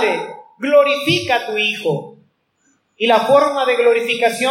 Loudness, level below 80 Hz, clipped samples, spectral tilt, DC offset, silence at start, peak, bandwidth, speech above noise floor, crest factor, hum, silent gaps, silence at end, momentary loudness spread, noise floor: -16 LUFS; -66 dBFS; under 0.1%; -4 dB/octave; under 0.1%; 0 s; -2 dBFS; 16.5 kHz; 47 dB; 16 dB; none; none; 0 s; 10 LU; -62 dBFS